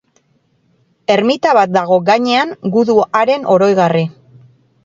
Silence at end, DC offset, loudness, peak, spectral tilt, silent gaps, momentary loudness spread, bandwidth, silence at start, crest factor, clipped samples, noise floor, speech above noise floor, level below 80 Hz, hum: 0.75 s; under 0.1%; -13 LUFS; 0 dBFS; -6 dB/octave; none; 4 LU; 7.8 kHz; 1.1 s; 14 dB; under 0.1%; -58 dBFS; 46 dB; -60 dBFS; none